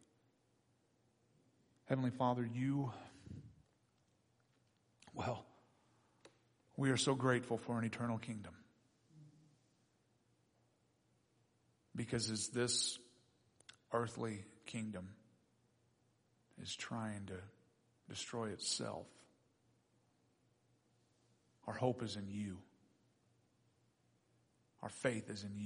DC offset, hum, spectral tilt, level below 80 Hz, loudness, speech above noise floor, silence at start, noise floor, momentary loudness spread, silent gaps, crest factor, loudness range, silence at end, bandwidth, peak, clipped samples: under 0.1%; none; -4.5 dB/octave; -78 dBFS; -41 LUFS; 37 dB; 1.85 s; -78 dBFS; 18 LU; none; 26 dB; 10 LU; 0 s; 10.5 kHz; -20 dBFS; under 0.1%